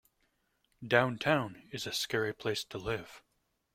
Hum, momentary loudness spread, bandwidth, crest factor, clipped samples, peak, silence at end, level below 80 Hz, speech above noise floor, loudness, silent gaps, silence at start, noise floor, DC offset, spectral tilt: none; 12 LU; 16.5 kHz; 26 dB; under 0.1%; -10 dBFS; 0.55 s; -64 dBFS; 45 dB; -33 LUFS; none; 0.8 s; -78 dBFS; under 0.1%; -4 dB/octave